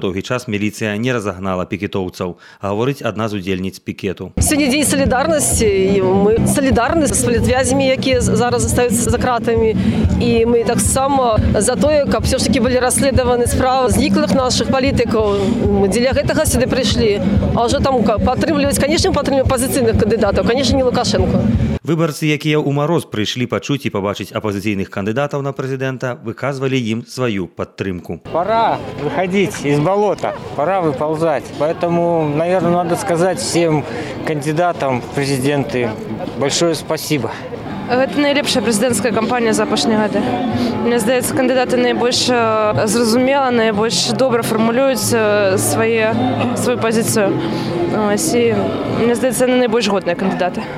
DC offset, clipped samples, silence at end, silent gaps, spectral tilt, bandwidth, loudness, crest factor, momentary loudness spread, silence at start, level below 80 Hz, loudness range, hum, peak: under 0.1%; under 0.1%; 0 s; none; -5 dB/octave; 16 kHz; -16 LUFS; 10 dB; 7 LU; 0 s; -32 dBFS; 5 LU; none; -4 dBFS